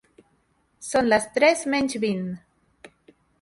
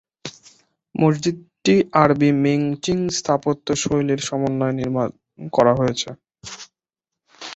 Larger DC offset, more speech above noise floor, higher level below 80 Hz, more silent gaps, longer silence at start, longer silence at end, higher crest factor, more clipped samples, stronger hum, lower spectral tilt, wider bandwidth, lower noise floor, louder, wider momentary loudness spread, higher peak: neither; second, 45 dB vs 67 dB; second, -60 dBFS vs -54 dBFS; neither; first, 0.8 s vs 0.25 s; first, 0.55 s vs 0 s; about the same, 20 dB vs 20 dB; neither; neither; second, -4 dB/octave vs -5.5 dB/octave; first, 11.5 kHz vs 8.2 kHz; second, -67 dBFS vs -86 dBFS; about the same, -22 LUFS vs -20 LUFS; second, 16 LU vs 20 LU; second, -6 dBFS vs 0 dBFS